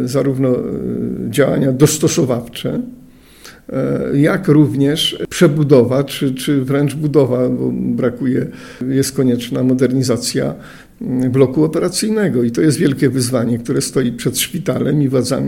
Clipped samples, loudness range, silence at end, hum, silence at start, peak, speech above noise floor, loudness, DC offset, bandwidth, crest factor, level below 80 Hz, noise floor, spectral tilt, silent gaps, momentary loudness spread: under 0.1%; 3 LU; 0 s; none; 0 s; 0 dBFS; 26 dB; -15 LUFS; under 0.1%; 17 kHz; 16 dB; -46 dBFS; -41 dBFS; -5.5 dB/octave; none; 9 LU